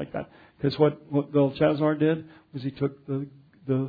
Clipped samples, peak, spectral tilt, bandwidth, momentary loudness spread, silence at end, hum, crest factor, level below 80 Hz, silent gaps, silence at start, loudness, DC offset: under 0.1%; -6 dBFS; -10 dB/octave; 5 kHz; 16 LU; 0 s; none; 20 dB; -62 dBFS; none; 0 s; -26 LUFS; under 0.1%